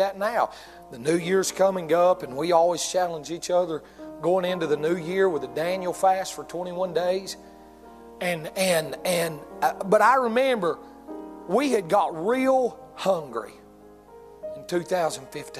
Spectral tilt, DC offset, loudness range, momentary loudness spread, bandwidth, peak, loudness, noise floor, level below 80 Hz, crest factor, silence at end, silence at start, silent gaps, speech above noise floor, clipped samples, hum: -4 dB/octave; under 0.1%; 4 LU; 14 LU; 15 kHz; -6 dBFS; -24 LUFS; -49 dBFS; -62 dBFS; 18 dB; 0 s; 0 s; none; 25 dB; under 0.1%; none